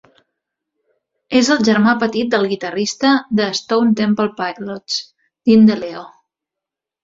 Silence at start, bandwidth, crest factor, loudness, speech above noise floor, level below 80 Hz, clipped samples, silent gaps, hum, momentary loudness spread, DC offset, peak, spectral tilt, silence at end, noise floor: 1.3 s; 7.6 kHz; 16 dB; -16 LUFS; 69 dB; -58 dBFS; under 0.1%; none; none; 12 LU; under 0.1%; -2 dBFS; -4.5 dB/octave; 0.95 s; -85 dBFS